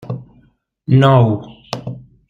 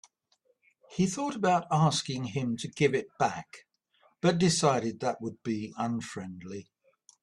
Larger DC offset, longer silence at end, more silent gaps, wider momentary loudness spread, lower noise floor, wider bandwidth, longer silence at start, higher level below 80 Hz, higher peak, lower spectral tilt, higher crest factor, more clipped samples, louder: neither; second, 0.3 s vs 0.6 s; neither; first, 20 LU vs 16 LU; second, -54 dBFS vs -72 dBFS; second, 7.2 kHz vs 12 kHz; second, 0 s vs 0.9 s; first, -50 dBFS vs -66 dBFS; first, -2 dBFS vs -10 dBFS; first, -8 dB/octave vs -5 dB/octave; about the same, 16 dB vs 20 dB; neither; first, -13 LUFS vs -29 LUFS